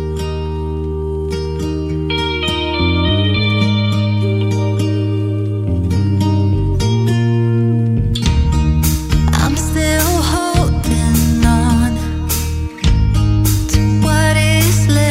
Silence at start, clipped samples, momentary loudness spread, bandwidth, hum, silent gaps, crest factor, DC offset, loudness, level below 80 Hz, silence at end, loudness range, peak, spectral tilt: 0 s; under 0.1%; 8 LU; 16.5 kHz; none; none; 14 dB; under 0.1%; -15 LUFS; -22 dBFS; 0 s; 2 LU; 0 dBFS; -5.5 dB/octave